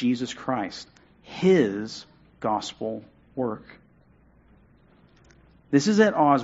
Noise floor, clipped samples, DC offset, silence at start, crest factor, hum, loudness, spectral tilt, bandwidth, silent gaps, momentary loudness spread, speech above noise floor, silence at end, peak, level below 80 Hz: -58 dBFS; under 0.1%; under 0.1%; 0 s; 20 dB; none; -25 LUFS; -5.5 dB/octave; 8 kHz; none; 20 LU; 34 dB; 0 s; -6 dBFS; -62 dBFS